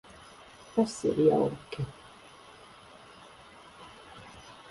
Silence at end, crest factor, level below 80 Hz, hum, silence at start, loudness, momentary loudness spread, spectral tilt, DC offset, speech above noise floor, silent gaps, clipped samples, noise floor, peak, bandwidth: 0.2 s; 22 dB; -62 dBFS; none; 0.75 s; -29 LUFS; 26 LU; -6.5 dB/octave; under 0.1%; 25 dB; none; under 0.1%; -52 dBFS; -10 dBFS; 11.5 kHz